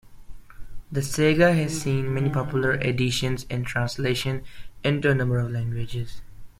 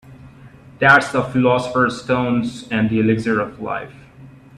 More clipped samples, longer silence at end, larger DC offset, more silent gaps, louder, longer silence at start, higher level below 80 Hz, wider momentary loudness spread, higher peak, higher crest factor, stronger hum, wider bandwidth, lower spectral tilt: neither; second, 0.1 s vs 0.3 s; neither; neither; second, -24 LUFS vs -18 LUFS; about the same, 0.05 s vs 0.05 s; first, -44 dBFS vs -50 dBFS; second, 11 LU vs 14 LU; second, -6 dBFS vs 0 dBFS; about the same, 18 dB vs 18 dB; neither; first, 15.5 kHz vs 11.5 kHz; about the same, -5.5 dB/octave vs -6.5 dB/octave